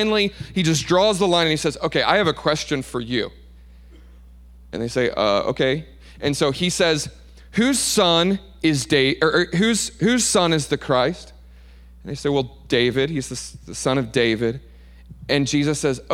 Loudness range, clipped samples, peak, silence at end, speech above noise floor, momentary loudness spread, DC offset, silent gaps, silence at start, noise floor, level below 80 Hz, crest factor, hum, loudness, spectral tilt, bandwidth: 6 LU; under 0.1%; -2 dBFS; 0 s; 24 dB; 10 LU; under 0.1%; none; 0 s; -44 dBFS; -44 dBFS; 20 dB; none; -20 LUFS; -4 dB/octave; 16.5 kHz